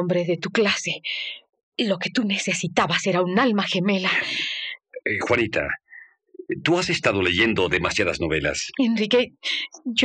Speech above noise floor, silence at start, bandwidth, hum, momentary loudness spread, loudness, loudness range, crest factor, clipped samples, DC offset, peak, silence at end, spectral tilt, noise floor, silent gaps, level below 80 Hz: 26 dB; 0 s; 10.5 kHz; none; 9 LU; -22 LUFS; 3 LU; 20 dB; under 0.1%; under 0.1%; -4 dBFS; 0 s; -4 dB/octave; -48 dBFS; 1.63-1.72 s; -52 dBFS